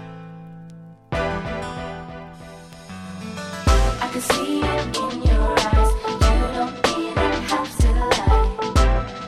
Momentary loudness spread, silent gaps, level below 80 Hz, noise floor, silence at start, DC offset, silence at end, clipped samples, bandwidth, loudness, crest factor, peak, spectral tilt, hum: 20 LU; none; -24 dBFS; -41 dBFS; 0 s; under 0.1%; 0 s; under 0.1%; 14 kHz; -21 LUFS; 18 dB; -4 dBFS; -5 dB/octave; none